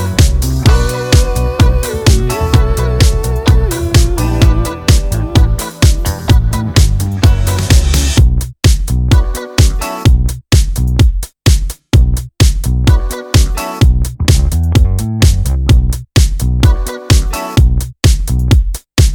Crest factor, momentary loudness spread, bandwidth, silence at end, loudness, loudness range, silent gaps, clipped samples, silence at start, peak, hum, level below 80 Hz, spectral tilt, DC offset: 10 dB; 3 LU; 18.5 kHz; 0 s; -12 LUFS; 1 LU; none; 0.3%; 0 s; 0 dBFS; none; -12 dBFS; -5 dB/octave; under 0.1%